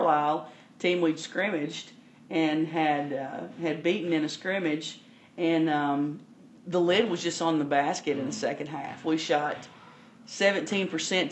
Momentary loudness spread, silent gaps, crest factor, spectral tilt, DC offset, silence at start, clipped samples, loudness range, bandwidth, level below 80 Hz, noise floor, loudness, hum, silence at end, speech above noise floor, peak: 13 LU; none; 18 dB; -4.5 dB/octave; under 0.1%; 0 s; under 0.1%; 2 LU; 8.6 kHz; -80 dBFS; -52 dBFS; -28 LUFS; none; 0 s; 24 dB; -10 dBFS